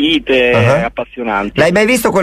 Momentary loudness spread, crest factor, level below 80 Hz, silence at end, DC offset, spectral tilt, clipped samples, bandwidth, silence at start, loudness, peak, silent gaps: 8 LU; 12 dB; -38 dBFS; 0 s; under 0.1%; -5 dB/octave; under 0.1%; 15.5 kHz; 0 s; -12 LUFS; 0 dBFS; none